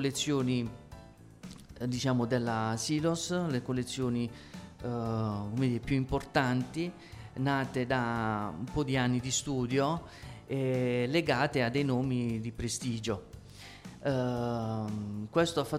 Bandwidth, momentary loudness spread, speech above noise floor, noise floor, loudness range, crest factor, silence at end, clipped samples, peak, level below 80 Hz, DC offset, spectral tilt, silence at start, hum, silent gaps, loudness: 14.5 kHz; 18 LU; 21 dB; -52 dBFS; 3 LU; 20 dB; 0 s; under 0.1%; -12 dBFS; -54 dBFS; under 0.1%; -5.5 dB/octave; 0 s; none; none; -32 LUFS